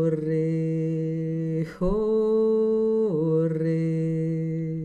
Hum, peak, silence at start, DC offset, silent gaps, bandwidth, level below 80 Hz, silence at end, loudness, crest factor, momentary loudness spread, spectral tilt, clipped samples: none; -12 dBFS; 0 s; under 0.1%; none; 7 kHz; -46 dBFS; 0 s; -25 LUFS; 12 dB; 6 LU; -10.5 dB/octave; under 0.1%